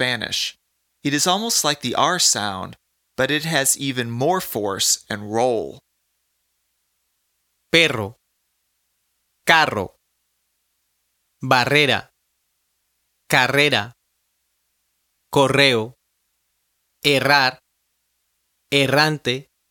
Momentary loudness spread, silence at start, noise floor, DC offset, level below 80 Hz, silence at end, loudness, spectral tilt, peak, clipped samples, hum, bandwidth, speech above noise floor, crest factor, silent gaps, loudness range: 13 LU; 0 s; -71 dBFS; under 0.1%; -60 dBFS; 0.3 s; -18 LUFS; -2.5 dB/octave; 0 dBFS; under 0.1%; none; 18 kHz; 52 dB; 22 dB; none; 4 LU